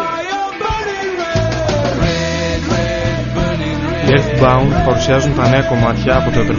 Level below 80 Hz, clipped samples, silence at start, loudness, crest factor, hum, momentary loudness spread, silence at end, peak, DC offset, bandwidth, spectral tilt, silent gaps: -26 dBFS; under 0.1%; 0 s; -15 LUFS; 14 dB; none; 7 LU; 0 s; 0 dBFS; under 0.1%; 7.4 kHz; -5 dB/octave; none